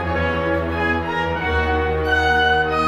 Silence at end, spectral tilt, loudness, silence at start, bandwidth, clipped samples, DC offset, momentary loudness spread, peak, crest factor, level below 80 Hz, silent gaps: 0 s; -6 dB/octave; -19 LUFS; 0 s; 12.5 kHz; under 0.1%; under 0.1%; 5 LU; -4 dBFS; 14 dB; -30 dBFS; none